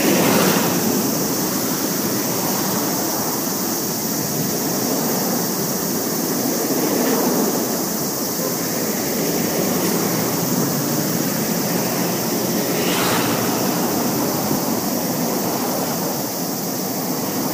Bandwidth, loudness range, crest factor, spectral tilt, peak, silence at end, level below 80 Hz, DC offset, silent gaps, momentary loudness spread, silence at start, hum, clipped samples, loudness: 15.5 kHz; 1 LU; 18 dB; -3.5 dB/octave; -2 dBFS; 0 s; -56 dBFS; under 0.1%; none; 3 LU; 0 s; none; under 0.1%; -19 LUFS